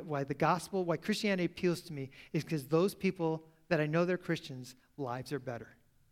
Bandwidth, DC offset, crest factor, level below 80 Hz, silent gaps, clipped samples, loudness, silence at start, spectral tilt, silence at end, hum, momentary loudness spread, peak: 16 kHz; under 0.1%; 20 dB; -68 dBFS; none; under 0.1%; -35 LUFS; 0 s; -6 dB/octave; 0.4 s; none; 13 LU; -14 dBFS